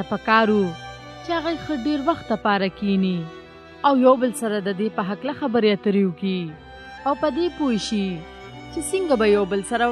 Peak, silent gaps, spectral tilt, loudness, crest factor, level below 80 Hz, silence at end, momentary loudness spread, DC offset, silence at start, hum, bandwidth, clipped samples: -2 dBFS; none; -5.5 dB/octave; -22 LUFS; 20 dB; -50 dBFS; 0 s; 17 LU; under 0.1%; 0 s; none; 13 kHz; under 0.1%